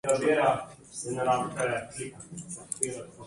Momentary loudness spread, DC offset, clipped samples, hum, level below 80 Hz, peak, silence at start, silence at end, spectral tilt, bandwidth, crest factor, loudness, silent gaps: 15 LU; under 0.1%; under 0.1%; none; -64 dBFS; -10 dBFS; 0.05 s; 0 s; -4 dB/octave; 11.5 kHz; 20 dB; -29 LUFS; none